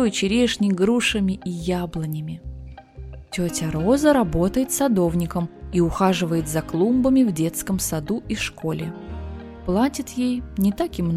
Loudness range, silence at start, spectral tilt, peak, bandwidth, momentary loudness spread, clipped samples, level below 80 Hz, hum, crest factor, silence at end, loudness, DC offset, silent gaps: 4 LU; 0 s; -5.5 dB/octave; -4 dBFS; 16 kHz; 15 LU; under 0.1%; -40 dBFS; none; 18 dB; 0 s; -22 LUFS; under 0.1%; none